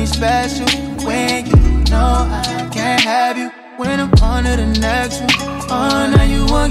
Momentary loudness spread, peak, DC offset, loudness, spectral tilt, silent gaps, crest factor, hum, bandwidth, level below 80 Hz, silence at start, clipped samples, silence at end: 7 LU; -2 dBFS; under 0.1%; -15 LUFS; -5 dB/octave; none; 12 dB; none; 14.5 kHz; -18 dBFS; 0 s; under 0.1%; 0 s